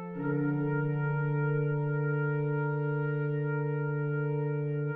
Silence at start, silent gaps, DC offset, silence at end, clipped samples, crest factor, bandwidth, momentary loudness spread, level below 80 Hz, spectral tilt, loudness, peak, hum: 0 s; none; under 0.1%; 0 s; under 0.1%; 10 dB; 3 kHz; 2 LU; -66 dBFS; -10 dB/octave; -31 LUFS; -20 dBFS; none